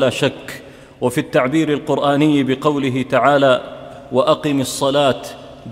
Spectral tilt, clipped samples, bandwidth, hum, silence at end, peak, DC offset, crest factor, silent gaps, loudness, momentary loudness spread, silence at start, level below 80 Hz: -5.5 dB/octave; under 0.1%; 16 kHz; none; 0 s; 0 dBFS; under 0.1%; 16 dB; none; -17 LUFS; 18 LU; 0 s; -52 dBFS